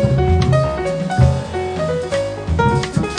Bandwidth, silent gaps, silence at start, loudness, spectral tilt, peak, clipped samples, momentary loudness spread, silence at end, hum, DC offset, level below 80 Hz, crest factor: 10 kHz; none; 0 s; -17 LUFS; -7 dB/octave; -2 dBFS; under 0.1%; 6 LU; 0 s; none; under 0.1%; -28 dBFS; 16 dB